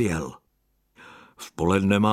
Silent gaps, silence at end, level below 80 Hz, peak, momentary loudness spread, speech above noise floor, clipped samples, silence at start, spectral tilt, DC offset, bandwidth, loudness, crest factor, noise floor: none; 0 s; -50 dBFS; -6 dBFS; 20 LU; 47 dB; under 0.1%; 0 s; -6 dB/octave; under 0.1%; 14 kHz; -24 LUFS; 18 dB; -70 dBFS